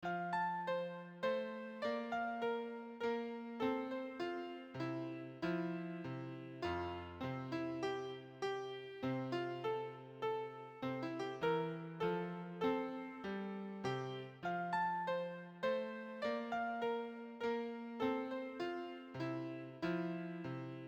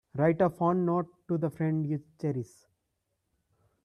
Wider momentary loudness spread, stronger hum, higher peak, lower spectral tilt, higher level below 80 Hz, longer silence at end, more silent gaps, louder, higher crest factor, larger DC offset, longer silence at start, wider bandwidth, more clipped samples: about the same, 7 LU vs 9 LU; neither; second, -26 dBFS vs -14 dBFS; second, -7 dB/octave vs -10 dB/octave; second, -76 dBFS vs -68 dBFS; second, 0 s vs 1.4 s; neither; second, -42 LUFS vs -30 LUFS; about the same, 16 dB vs 18 dB; neither; second, 0 s vs 0.15 s; first, 18 kHz vs 11.5 kHz; neither